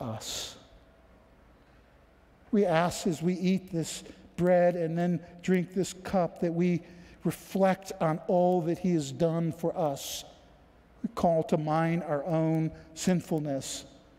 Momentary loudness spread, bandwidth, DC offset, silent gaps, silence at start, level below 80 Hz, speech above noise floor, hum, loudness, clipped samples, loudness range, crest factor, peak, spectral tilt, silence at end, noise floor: 10 LU; 15.5 kHz; under 0.1%; none; 0 s; -60 dBFS; 31 dB; none; -29 LUFS; under 0.1%; 3 LU; 18 dB; -12 dBFS; -6 dB/octave; 0.3 s; -59 dBFS